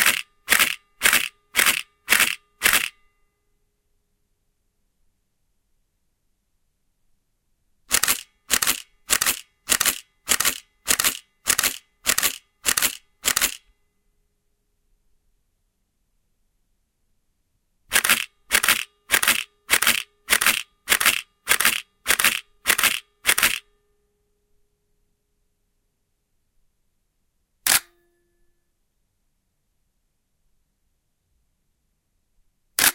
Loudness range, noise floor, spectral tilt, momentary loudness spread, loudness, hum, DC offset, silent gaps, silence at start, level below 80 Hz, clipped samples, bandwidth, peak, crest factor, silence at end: 8 LU; -72 dBFS; 1.5 dB/octave; 8 LU; -20 LUFS; none; under 0.1%; none; 0 s; -56 dBFS; under 0.1%; 17.5 kHz; 0 dBFS; 26 dB; 0 s